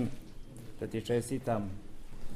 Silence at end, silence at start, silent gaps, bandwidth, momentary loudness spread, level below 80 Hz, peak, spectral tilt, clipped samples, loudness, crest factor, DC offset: 0 s; 0 s; none; 15.5 kHz; 18 LU; -48 dBFS; -20 dBFS; -6.5 dB/octave; under 0.1%; -36 LUFS; 16 dB; under 0.1%